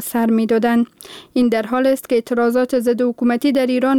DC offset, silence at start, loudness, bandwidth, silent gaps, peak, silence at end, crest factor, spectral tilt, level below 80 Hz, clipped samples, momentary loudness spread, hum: 0.1%; 0 s; -17 LUFS; 17.5 kHz; none; -8 dBFS; 0 s; 10 dB; -5 dB/octave; -58 dBFS; under 0.1%; 3 LU; none